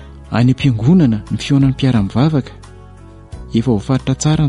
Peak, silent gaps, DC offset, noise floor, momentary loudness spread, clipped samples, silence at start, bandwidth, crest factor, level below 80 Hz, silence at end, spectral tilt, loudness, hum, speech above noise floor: -2 dBFS; none; under 0.1%; -37 dBFS; 9 LU; under 0.1%; 0 s; 11 kHz; 12 dB; -36 dBFS; 0 s; -7 dB/octave; -15 LUFS; none; 24 dB